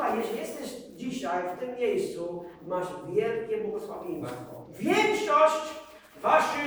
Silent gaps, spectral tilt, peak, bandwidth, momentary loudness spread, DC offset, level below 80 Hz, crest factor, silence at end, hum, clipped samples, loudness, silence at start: none; -4.5 dB/octave; -8 dBFS; over 20 kHz; 15 LU; under 0.1%; -66 dBFS; 20 dB; 0 s; none; under 0.1%; -29 LUFS; 0 s